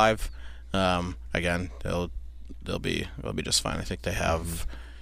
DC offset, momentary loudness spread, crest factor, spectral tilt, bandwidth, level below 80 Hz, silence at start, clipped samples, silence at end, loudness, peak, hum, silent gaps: under 0.1%; 15 LU; 20 dB; -4 dB/octave; 15.5 kHz; -38 dBFS; 0 s; under 0.1%; 0 s; -29 LUFS; -8 dBFS; none; none